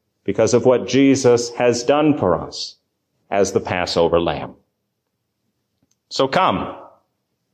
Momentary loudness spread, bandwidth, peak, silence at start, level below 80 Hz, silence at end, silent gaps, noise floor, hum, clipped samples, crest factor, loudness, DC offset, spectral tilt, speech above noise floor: 13 LU; 9.6 kHz; -4 dBFS; 0.25 s; -46 dBFS; 0.65 s; none; -74 dBFS; none; under 0.1%; 16 dB; -18 LUFS; under 0.1%; -5 dB/octave; 57 dB